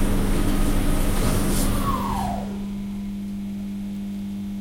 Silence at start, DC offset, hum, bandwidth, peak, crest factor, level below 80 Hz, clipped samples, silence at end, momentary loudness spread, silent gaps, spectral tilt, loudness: 0 s; under 0.1%; none; 16 kHz; -8 dBFS; 16 dB; -26 dBFS; under 0.1%; 0 s; 7 LU; none; -5.5 dB/octave; -26 LUFS